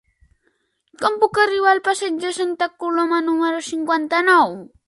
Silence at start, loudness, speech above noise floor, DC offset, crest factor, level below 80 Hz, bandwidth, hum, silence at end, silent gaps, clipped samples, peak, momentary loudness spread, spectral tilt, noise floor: 1 s; -18 LUFS; 48 dB; under 0.1%; 18 dB; -62 dBFS; 11.5 kHz; none; 0.2 s; none; under 0.1%; -2 dBFS; 8 LU; -3 dB/octave; -67 dBFS